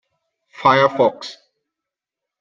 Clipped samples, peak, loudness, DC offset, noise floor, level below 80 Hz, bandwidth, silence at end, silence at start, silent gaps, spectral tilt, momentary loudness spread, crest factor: under 0.1%; -2 dBFS; -16 LUFS; under 0.1%; -85 dBFS; -66 dBFS; 7.4 kHz; 1.1 s; 0.6 s; none; -5.5 dB/octave; 19 LU; 20 dB